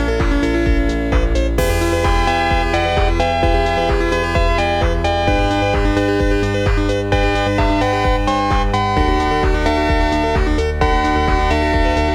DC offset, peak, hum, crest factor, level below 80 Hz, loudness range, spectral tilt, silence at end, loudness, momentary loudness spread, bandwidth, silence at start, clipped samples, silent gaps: 0.4%; -2 dBFS; none; 14 dB; -20 dBFS; 0 LU; -6 dB/octave; 0 s; -16 LUFS; 1 LU; 15 kHz; 0 s; under 0.1%; none